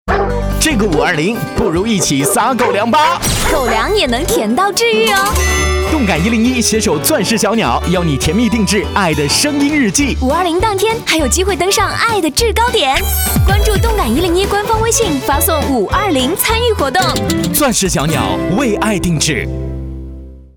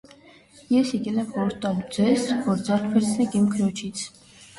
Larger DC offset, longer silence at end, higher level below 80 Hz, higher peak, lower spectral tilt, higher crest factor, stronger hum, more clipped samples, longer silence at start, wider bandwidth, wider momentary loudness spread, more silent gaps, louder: neither; about the same, 0.15 s vs 0.15 s; first, -24 dBFS vs -60 dBFS; first, 0 dBFS vs -8 dBFS; second, -4 dB/octave vs -5.5 dB/octave; about the same, 12 dB vs 16 dB; neither; neither; second, 0.05 s vs 0.7 s; first, over 20 kHz vs 11.5 kHz; second, 3 LU vs 8 LU; neither; first, -13 LUFS vs -24 LUFS